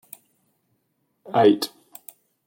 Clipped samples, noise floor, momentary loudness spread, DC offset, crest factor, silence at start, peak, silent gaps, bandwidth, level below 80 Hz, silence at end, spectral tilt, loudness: under 0.1%; -72 dBFS; 25 LU; under 0.1%; 20 dB; 1.3 s; -4 dBFS; none; 17 kHz; -76 dBFS; 0.8 s; -5.5 dB/octave; -21 LUFS